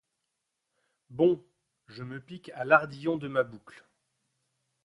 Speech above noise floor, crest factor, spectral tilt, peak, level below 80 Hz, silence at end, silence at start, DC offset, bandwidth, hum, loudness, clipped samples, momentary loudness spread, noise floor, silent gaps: 54 dB; 26 dB; -7.5 dB/octave; -6 dBFS; -72 dBFS; 1.15 s; 1.1 s; under 0.1%; 11 kHz; none; -28 LUFS; under 0.1%; 20 LU; -83 dBFS; none